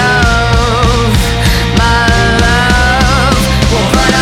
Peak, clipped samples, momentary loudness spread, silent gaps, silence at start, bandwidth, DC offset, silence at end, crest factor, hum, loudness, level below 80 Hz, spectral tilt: 0 dBFS; under 0.1%; 2 LU; none; 0 s; 16.5 kHz; under 0.1%; 0 s; 8 dB; none; -9 LUFS; -14 dBFS; -4.5 dB/octave